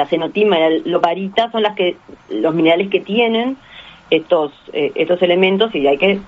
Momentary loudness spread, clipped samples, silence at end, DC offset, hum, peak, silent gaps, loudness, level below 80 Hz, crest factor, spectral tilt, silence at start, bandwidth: 7 LU; under 0.1%; 0 s; under 0.1%; none; 0 dBFS; none; -16 LUFS; -56 dBFS; 16 dB; -3 dB/octave; 0 s; 7.6 kHz